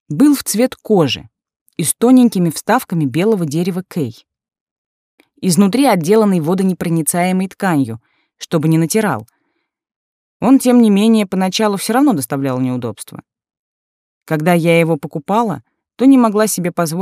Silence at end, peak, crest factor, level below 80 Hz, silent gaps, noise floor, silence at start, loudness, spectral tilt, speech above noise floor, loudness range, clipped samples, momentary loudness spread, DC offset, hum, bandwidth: 0 s; -2 dBFS; 14 dB; -60 dBFS; 1.61-1.66 s, 4.61-5.18 s, 9.96-10.40 s, 13.59-14.21 s; -69 dBFS; 0.1 s; -14 LUFS; -5.5 dB/octave; 55 dB; 4 LU; under 0.1%; 12 LU; under 0.1%; none; 16 kHz